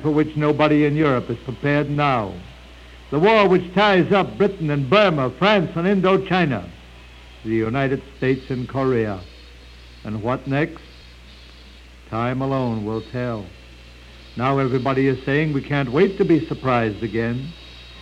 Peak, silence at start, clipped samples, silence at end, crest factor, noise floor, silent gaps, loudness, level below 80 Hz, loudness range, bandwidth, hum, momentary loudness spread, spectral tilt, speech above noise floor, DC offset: -2 dBFS; 0 s; under 0.1%; 0 s; 18 dB; -43 dBFS; none; -20 LUFS; -44 dBFS; 9 LU; 9.4 kHz; none; 14 LU; -7.5 dB/octave; 24 dB; under 0.1%